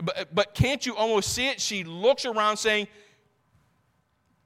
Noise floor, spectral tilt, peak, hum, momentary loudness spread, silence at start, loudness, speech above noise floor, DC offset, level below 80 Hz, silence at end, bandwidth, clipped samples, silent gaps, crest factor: -70 dBFS; -3.5 dB/octave; -8 dBFS; none; 4 LU; 0 s; -25 LUFS; 44 dB; under 0.1%; -52 dBFS; 1.6 s; 16.5 kHz; under 0.1%; none; 20 dB